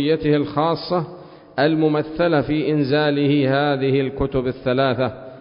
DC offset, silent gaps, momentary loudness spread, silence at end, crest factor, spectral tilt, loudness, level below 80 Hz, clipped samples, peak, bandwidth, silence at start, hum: under 0.1%; none; 6 LU; 0 s; 14 dB; -11.5 dB/octave; -20 LUFS; -44 dBFS; under 0.1%; -6 dBFS; 5.4 kHz; 0 s; none